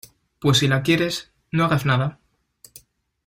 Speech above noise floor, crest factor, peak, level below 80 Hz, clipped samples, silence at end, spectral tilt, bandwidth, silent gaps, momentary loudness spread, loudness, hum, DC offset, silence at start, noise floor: 34 dB; 18 dB; -4 dBFS; -52 dBFS; under 0.1%; 1.15 s; -5 dB/octave; 16 kHz; none; 10 LU; -21 LUFS; none; under 0.1%; 0.4 s; -54 dBFS